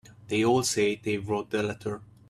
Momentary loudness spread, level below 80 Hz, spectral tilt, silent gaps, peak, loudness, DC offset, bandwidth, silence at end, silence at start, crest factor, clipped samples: 9 LU; -62 dBFS; -4.5 dB/octave; none; -12 dBFS; -28 LUFS; under 0.1%; 14.5 kHz; 0.25 s; 0.1 s; 16 dB; under 0.1%